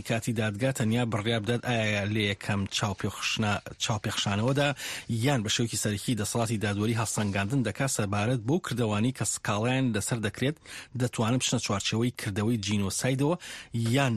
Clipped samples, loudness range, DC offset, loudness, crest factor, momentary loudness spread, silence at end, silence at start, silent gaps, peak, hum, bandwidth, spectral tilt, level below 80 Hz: under 0.1%; 1 LU; under 0.1%; -28 LUFS; 16 dB; 4 LU; 0 s; 0 s; none; -12 dBFS; none; 13 kHz; -4.5 dB/octave; -58 dBFS